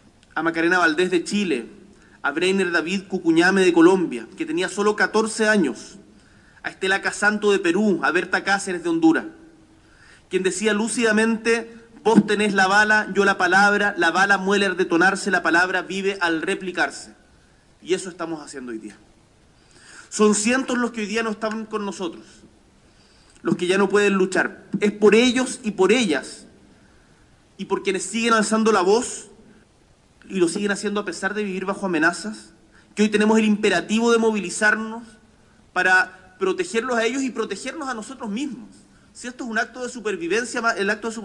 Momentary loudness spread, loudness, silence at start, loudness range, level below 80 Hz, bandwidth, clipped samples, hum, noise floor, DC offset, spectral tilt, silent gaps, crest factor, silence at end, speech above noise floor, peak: 14 LU; -20 LUFS; 0.35 s; 8 LU; -60 dBFS; 11.5 kHz; under 0.1%; none; -56 dBFS; under 0.1%; -4 dB/octave; none; 20 dB; 0 s; 35 dB; -2 dBFS